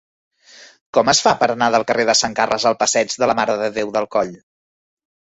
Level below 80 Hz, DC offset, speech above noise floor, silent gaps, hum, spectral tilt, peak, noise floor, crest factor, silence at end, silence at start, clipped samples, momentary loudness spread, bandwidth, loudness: -56 dBFS; under 0.1%; 29 dB; 0.81-0.93 s; none; -2 dB/octave; -2 dBFS; -46 dBFS; 18 dB; 1.05 s; 0.6 s; under 0.1%; 7 LU; 8.4 kHz; -17 LUFS